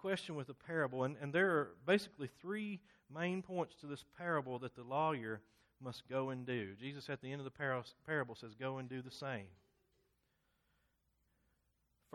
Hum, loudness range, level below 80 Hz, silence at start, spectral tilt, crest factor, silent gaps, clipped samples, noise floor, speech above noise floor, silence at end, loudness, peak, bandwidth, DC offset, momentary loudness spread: none; 10 LU; -80 dBFS; 0 s; -6 dB/octave; 22 dB; none; under 0.1%; -81 dBFS; 40 dB; 2.6 s; -41 LUFS; -20 dBFS; 13 kHz; under 0.1%; 13 LU